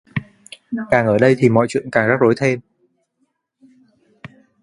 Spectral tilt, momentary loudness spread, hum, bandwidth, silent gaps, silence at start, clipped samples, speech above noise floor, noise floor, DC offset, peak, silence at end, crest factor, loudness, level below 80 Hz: -7 dB/octave; 15 LU; none; 11 kHz; none; 0.15 s; under 0.1%; 53 dB; -69 dBFS; under 0.1%; 0 dBFS; 0.35 s; 18 dB; -17 LUFS; -54 dBFS